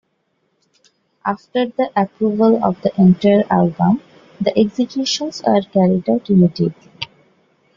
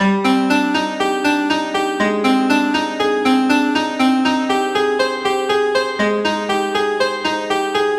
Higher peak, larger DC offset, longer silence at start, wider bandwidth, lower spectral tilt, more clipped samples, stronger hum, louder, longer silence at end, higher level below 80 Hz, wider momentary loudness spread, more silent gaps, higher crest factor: about the same, -2 dBFS vs -2 dBFS; neither; first, 1.25 s vs 0 s; second, 7.4 kHz vs 14 kHz; first, -7 dB/octave vs -4.5 dB/octave; neither; neither; about the same, -16 LUFS vs -17 LUFS; first, 0.7 s vs 0 s; about the same, -56 dBFS vs -56 dBFS; first, 10 LU vs 4 LU; neither; about the same, 16 dB vs 14 dB